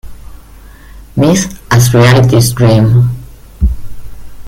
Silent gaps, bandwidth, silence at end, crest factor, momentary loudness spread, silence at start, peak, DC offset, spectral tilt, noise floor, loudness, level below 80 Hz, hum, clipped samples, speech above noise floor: none; 16 kHz; 0 s; 10 dB; 12 LU; 0.05 s; 0 dBFS; under 0.1%; -6 dB/octave; -34 dBFS; -9 LUFS; -24 dBFS; none; under 0.1%; 27 dB